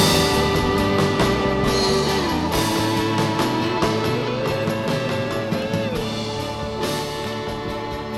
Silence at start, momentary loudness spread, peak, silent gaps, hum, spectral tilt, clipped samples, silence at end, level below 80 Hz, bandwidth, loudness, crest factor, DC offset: 0 s; 8 LU; -4 dBFS; none; none; -4.5 dB/octave; under 0.1%; 0 s; -38 dBFS; 18.5 kHz; -21 LUFS; 16 dB; under 0.1%